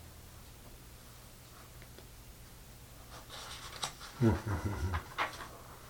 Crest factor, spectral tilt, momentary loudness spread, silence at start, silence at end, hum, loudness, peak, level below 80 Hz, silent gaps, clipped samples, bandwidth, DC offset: 22 dB; -5.5 dB/octave; 21 LU; 0 s; 0 s; none; -37 LUFS; -18 dBFS; -50 dBFS; none; under 0.1%; 19.5 kHz; under 0.1%